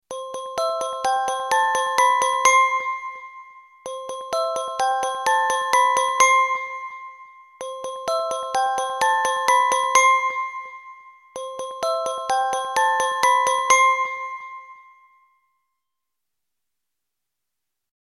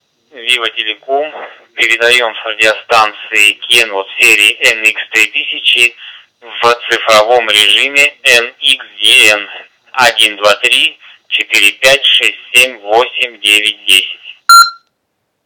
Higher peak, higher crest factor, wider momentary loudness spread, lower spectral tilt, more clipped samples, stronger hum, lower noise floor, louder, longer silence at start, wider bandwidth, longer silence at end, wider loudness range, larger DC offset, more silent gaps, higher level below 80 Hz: about the same, -2 dBFS vs 0 dBFS; first, 22 dB vs 10 dB; first, 19 LU vs 11 LU; about the same, 1 dB/octave vs 0.5 dB/octave; second, under 0.1% vs 2%; neither; first, -84 dBFS vs -67 dBFS; second, -20 LUFS vs -8 LUFS; second, 0.1 s vs 0.35 s; second, 16 kHz vs over 20 kHz; first, 3.25 s vs 0.7 s; about the same, 4 LU vs 2 LU; neither; neither; second, -68 dBFS vs -56 dBFS